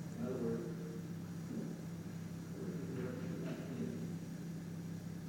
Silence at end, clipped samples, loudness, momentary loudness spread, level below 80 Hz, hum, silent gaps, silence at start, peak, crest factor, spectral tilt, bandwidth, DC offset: 0 s; under 0.1%; -44 LUFS; 6 LU; -70 dBFS; none; none; 0 s; -30 dBFS; 14 dB; -7 dB/octave; 17 kHz; under 0.1%